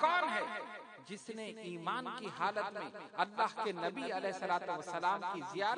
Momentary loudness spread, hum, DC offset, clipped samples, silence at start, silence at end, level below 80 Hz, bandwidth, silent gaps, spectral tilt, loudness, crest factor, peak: 10 LU; none; under 0.1%; under 0.1%; 0 s; 0 s; under -90 dBFS; 10.5 kHz; none; -4 dB/octave; -38 LUFS; 20 dB; -16 dBFS